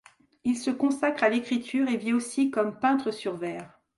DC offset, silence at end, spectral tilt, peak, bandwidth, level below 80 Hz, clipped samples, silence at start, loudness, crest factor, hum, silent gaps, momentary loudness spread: under 0.1%; 0.3 s; -4.5 dB/octave; -10 dBFS; 11.5 kHz; -72 dBFS; under 0.1%; 0.45 s; -27 LUFS; 18 dB; none; none; 8 LU